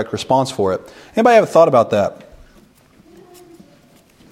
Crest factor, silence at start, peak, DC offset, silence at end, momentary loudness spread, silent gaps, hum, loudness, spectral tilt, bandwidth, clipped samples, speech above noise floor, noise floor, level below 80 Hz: 18 dB; 0 s; 0 dBFS; under 0.1%; 2.15 s; 12 LU; none; none; -15 LUFS; -5.5 dB/octave; 15 kHz; under 0.1%; 35 dB; -50 dBFS; -54 dBFS